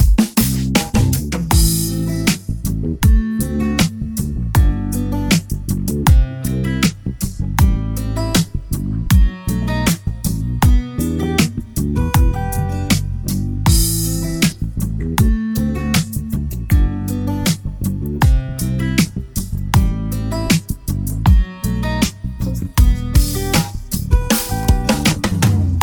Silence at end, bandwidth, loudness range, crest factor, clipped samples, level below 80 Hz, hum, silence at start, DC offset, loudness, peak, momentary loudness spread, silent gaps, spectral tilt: 0 s; 19 kHz; 2 LU; 16 dB; under 0.1%; -20 dBFS; none; 0 s; under 0.1%; -18 LUFS; 0 dBFS; 7 LU; none; -5 dB/octave